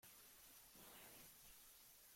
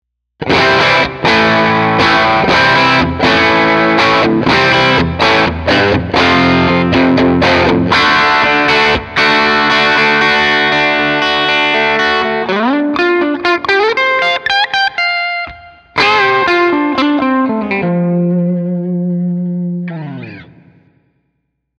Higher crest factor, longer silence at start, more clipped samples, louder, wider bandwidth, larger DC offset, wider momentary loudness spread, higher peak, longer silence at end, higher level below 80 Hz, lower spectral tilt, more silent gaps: about the same, 16 dB vs 12 dB; second, 0 s vs 0.4 s; neither; second, -62 LUFS vs -10 LUFS; first, 16.5 kHz vs 10.5 kHz; neither; second, 3 LU vs 8 LU; second, -48 dBFS vs 0 dBFS; second, 0 s vs 1.35 s; second, -82 dBFS vs -40 dBFS; second, -1 dB/octave vs -5.5 dB/octave; neither